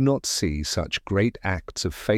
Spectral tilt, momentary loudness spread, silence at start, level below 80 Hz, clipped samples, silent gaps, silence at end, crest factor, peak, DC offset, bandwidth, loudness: -4.5 dB/octave; 5 LU; 0 s; -40 dBFS; under 0.1%; none; 0 s; 16 dB; -8 dBFS; under 0.1%; 16.5 kHz; -25 LUFS